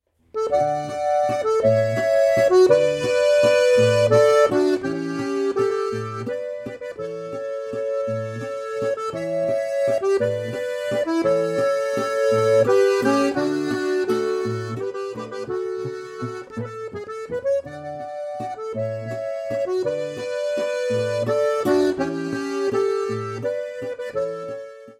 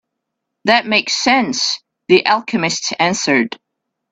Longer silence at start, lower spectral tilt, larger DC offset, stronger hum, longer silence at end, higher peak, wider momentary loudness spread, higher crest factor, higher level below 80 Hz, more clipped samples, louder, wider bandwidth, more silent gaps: second, 0.35 s vs 0.65 s; first, -5.5 dB/octave vs -3 dB/octave; neither; neither; second, 0.05 s vs 0.55 s; second, -4 dBFS vs 0 dBFS; first, 15 LU vs 9 LU; about the same, 18 dB vs 18 dB; about the same, -60 dBFS vs -60 dBFS; neither; second, -22 LUFS vs -15 LUFS; first, 16 kHz vs 8.4 kHz; neither